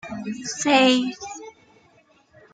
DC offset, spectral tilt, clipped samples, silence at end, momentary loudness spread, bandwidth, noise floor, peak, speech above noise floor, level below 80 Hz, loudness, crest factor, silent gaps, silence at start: under 0.1%; -2.5 dB/octave; under 0.1%; 1.05 s; 20 LU; 9.4 kHz; -58 dBFS; -4 dBFS; 37 dB; -66 dBFS; -20 LUFS; 20 dB; none; 0.05 s